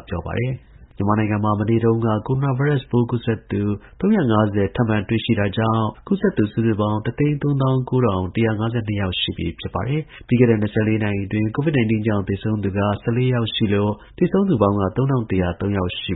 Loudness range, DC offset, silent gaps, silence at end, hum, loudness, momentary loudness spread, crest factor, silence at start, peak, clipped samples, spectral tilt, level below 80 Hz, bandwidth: 1 LU; under 0.1%; none; 0 s; none; -20 LUFS; 6 LU; 18 dB; 0.1 s; -2 dBFS; under 0.1%; -12.5 dB/octave; -44 dBFS; 4.1 kHz